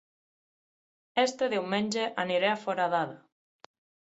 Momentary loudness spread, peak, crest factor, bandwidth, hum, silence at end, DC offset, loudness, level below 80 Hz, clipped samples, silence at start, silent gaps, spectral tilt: 4 LU; -12 dBFS; 20 dB; 8.2 kHz; none; 0.95 s; under 0.1%; -29 LUFS; -78 dBFS; under 0.1%; 1.15 s; none; -4 dB/octave